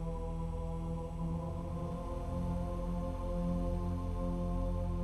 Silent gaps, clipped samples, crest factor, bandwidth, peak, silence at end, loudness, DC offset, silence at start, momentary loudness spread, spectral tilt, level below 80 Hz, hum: none; under 0.1%; 12 dB; 12 kHz; -24 dBFS; 0 s; -39 LUFS; under 0.1%; 0 s; 4 LU; -9 dB/octave; -40 dBFS; none